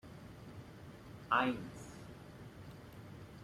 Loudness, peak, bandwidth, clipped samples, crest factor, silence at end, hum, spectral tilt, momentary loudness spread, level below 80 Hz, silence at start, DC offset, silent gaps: -37 LUFS; -18 dBFS; 16 kHz; under 0.1%; 24 dB; 0 s; none; -5.5 dB/octave; 20 LU; -64 dBFS; 0.05 s; under 0.1%; none